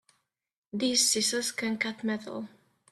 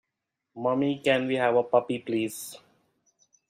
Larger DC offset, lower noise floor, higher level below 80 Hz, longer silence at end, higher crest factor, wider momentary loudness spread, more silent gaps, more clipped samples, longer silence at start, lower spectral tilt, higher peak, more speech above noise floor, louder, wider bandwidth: neither; second, -71 dBFS vs -84 dBFS; about the same, -74 dBFS vs -72 dBFS; second, 0.45 s vs 0.95 s; about the same, 20 dB vs 20 dB; first, 17 LU vs 9 LU; neither; neither; first, 0.75 s vs 0.55 s; second, -1.5 dB/octave vs -5 dB/octave; second, -12 dBFS vs -8 dBFS; second, 41 dB vs 58 dB; about the same, -27 LUFS vs -26 LUFS; about the same, 15 kHz vs 15.5 kHz